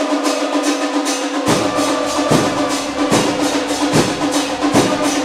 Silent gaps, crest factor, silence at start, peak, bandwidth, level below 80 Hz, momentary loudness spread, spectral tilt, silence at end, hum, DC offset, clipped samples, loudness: none; 16 dB; 0 s; 0 dBFS; 15.5 kHz; -46 dBFS; 3 LU; -4 dB/octave; 0 s; none; under 0.1%; under 0.1%; -16 LUFS